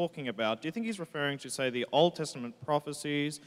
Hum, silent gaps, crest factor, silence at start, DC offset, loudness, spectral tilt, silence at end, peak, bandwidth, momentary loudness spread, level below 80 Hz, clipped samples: none; none; 20 dB; 0 s; under 0.1%; -32 LUFS; -4.5 dB/octave; 0 s; -12 dBFS; 16 kHz; 9 LU; -76 dBFS; under 0.1%